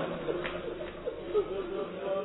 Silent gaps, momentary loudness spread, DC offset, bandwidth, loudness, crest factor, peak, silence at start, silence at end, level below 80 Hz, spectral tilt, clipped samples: none; 7 LU; under 0.1%; 4.1 kHz; -35 LUFS; 18 dB; -16 dBFS; 0 s; 0 s; -54 dBFS; -4 dB/octave; under 0.1%